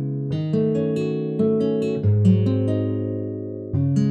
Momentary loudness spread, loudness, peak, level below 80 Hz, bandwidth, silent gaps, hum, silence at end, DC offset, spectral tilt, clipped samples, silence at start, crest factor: 9 LU; -22 LUFS; -6 dBFS; -54 dBFS; 8.2 kHz; none; none; 0 s; under 0.1%; -10 dB/octave; under 0.1%; 0 s; 14 dB